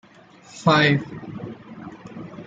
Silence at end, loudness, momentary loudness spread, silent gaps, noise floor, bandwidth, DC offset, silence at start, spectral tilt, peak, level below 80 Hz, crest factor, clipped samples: 0.05 s; -19 LUFS; 22 LU; none; -49 dBFS; 7.8 kHz; under 0.1%; 0.55 s; -6 dB/octave; -4 dBFS; -60 dBFS; 20 dB; under 0.1%